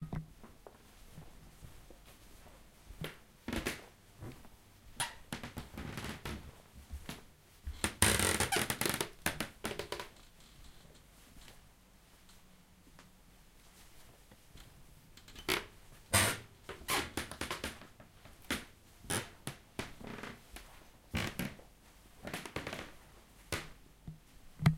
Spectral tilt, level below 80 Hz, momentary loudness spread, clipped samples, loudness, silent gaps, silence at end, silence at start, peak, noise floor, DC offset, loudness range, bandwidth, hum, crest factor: -3 dB/octave; -54 dBFS; 27 LU; under 0.1%; -38 LUFS; none; 0 s; 0 s; -8 dBFS; -62 dBFS; under 0.1%; 18 LU; 16.5 kHz; none; 34 dB